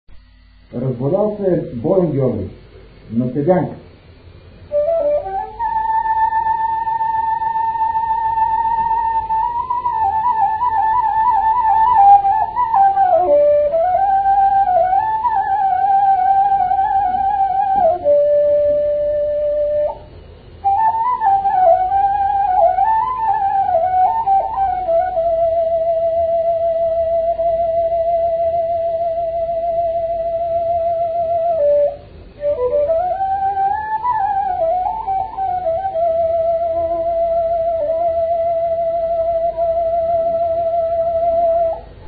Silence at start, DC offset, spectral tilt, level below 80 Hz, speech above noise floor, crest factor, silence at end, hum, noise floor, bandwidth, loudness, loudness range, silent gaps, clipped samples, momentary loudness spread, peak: 0.1 s; under 0.1%; -12 dB/octave; -42 dBFS; 28 dB; 16 dB; 0 s; none; -46 dBFS; 4.7 kHz; -16 LUFS; 5 LU; none; under 0.1%; 6 LU; -2 dBFS